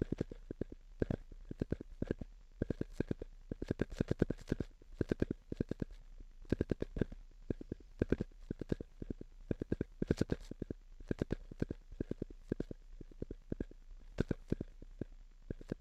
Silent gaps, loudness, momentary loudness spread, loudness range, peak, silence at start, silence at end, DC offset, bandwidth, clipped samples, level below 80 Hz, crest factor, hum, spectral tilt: none; -43 LUFS; 13 LU; 4 LU; -16 dBFS; 0 s; 0 s; under 0.1%; 10.5 kHz; under 0.1%; -50 dBFS; 26 dB; none; -8.5 dB/octave